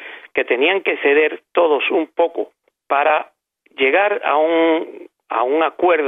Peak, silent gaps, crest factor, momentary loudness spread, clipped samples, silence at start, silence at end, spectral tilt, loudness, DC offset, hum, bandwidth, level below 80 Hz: -2 dBFS; none; 16 dB; 9 LU; under 0.1%; 0 s; 0 s; -5.5 dB/octave; -17 LUFS; under 0.1%; none; 3.9 kHz; -70 dBFS